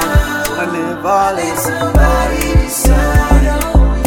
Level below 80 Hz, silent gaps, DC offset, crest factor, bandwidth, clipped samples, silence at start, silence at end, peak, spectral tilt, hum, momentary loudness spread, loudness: -14 dBFS; none; under 0.1%; 12 dB; 18.5 kHz; under 0.1%; 0 s; 0 s; 0 dBFS; -5 dB/octave; none; 5 LU; -13 LUFS